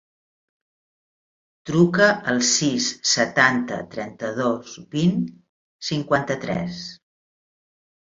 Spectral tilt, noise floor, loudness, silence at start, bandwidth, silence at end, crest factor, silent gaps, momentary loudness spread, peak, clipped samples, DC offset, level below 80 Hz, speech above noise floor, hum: -3.5 dB/octave; under -90 dBFS; -21 LUFS; 1.65 s; 7.8 kHz; 1.05 s; 22 dB; 5.49-5.79 s; 15 LU; -2 dBFS; under 0.1%; under 0.1%; -60 dBFS; over 69 dB; none